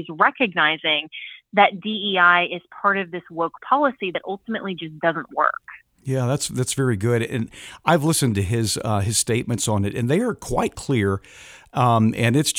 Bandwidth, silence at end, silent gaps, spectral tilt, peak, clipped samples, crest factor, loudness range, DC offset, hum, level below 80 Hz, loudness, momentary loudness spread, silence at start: 19.5 kHz; 0 s; none; -4.5 dB/octave; 0 dBFS; under 0.1%; 20 dB; 4 LU; under 0.1%; none; -50 dBFS; -21 LUFS; 10 LU; 0 s